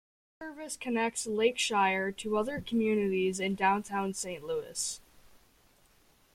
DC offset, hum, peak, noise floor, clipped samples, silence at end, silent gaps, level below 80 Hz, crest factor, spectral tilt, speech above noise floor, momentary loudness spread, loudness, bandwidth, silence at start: under 0.1%; none; -14 dBFS; -65 dBFS; under 0.1%; 0.95 s; none; -64 dBFS; 18 dB; -3.5 dB/octave; 34 dB; 11 LU; -31 LUFS; 16 kHz; 0.4 s